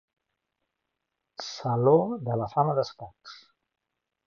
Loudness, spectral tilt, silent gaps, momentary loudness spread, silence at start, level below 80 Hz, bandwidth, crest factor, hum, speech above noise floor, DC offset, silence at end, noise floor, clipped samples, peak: -26 LUFS; -7.5 dB/octave; none; 25 LU; 1.4 s; -66 dBFS; 7.2 kHz; 20 dB; none; 58 dB; under 0.1%; 0.9 s; -83 dBFS; under 0.1%; -10 dBFS